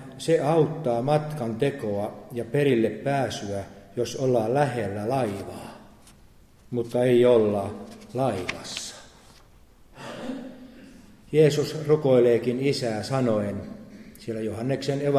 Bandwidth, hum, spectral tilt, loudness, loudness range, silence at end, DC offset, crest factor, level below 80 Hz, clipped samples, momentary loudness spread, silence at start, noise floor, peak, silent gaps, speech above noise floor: 14.5 kHz; none; -6.5 dB/octave; -25 LUFS; 5 LU; 0 s; under 0.1%; 18 dB; -56 dBFS; under 0.1%; 18 LU; 0 s; -53 dBFS; -8 dBFS; none; 29 dB